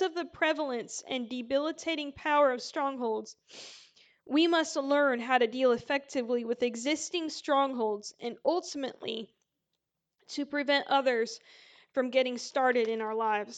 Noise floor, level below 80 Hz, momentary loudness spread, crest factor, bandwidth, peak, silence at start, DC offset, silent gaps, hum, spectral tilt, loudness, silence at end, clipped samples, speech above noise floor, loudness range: -85 dBFS; -76 dBFS; 12 LU; 20 dB; 9.2 kHz; -12 dBFS; 0 s; under 0.1%; none; none; -2.5 dB/octave; -30 LUFS; 0 s; under 0.1%; 55 dB; 4 LU